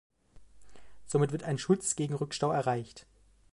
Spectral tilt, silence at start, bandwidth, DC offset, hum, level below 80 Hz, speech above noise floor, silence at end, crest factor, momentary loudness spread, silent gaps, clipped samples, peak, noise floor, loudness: -5 dB/octave; 0.35 s; 11.5 kHz; under 0.1%; none; -64 dBFS; 28 dB; 0.5 s; 20 dB; 6 LU; none; under 0.1%; -14 dBFS; -58 dBFS; -31 LUFS